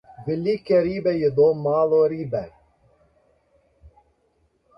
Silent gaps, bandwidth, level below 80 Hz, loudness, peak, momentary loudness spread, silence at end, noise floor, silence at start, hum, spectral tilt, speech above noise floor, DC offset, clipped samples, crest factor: none; 5.8 kHz; -56 dBFS; -21 LUFS; -8 dBFS; 11 LU; 0.9 s; -66 dBFS; 0.2 s; none; -9.5 dB/octave; 46 dB; under 0.1%; under 0.1%; 16 dB